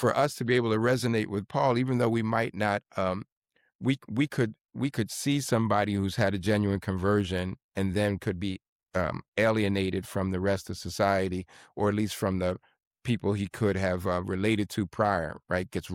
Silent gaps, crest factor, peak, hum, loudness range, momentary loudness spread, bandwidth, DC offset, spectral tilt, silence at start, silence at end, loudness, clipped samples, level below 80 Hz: 3.32-3.42 s, 3.75-3.79 s, 7.64-7.69 s, 8.68-8.79 s, 9.28-9.32 s, 12.87-12.91 s; 16 dB; -12 dBFS; none; 2 LU; 7 LU; 16.5 kHz; under 0.1%; -6 dB/octave; 0 s; 0 s; -29 LUFS; under 0.1%; -56 dBFS